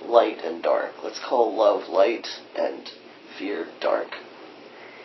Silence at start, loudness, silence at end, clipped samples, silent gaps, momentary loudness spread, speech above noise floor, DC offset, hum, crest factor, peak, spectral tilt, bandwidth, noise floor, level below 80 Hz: 0 s; -24 LUFS; 0 s; under 0.1%; none; 23 LU; 20 dB; under 0.1%; none; 22 dB; -2 dBFS; -3.5 dB/octave; 6.2 kHz; -44 dBFS; -84 dBFS